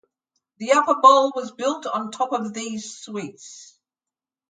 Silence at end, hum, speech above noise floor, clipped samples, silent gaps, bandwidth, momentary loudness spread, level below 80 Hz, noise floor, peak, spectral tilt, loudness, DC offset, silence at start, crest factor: 0.85 s; none; 69 dB; under 0.1%; none; 9.4 kHz; 20 LU; -78 dBFS; -90 dBFS; -2 dBFS; -3 dB/octave; -20 LUFS; under 0.1%; 0.6 s; 22 dB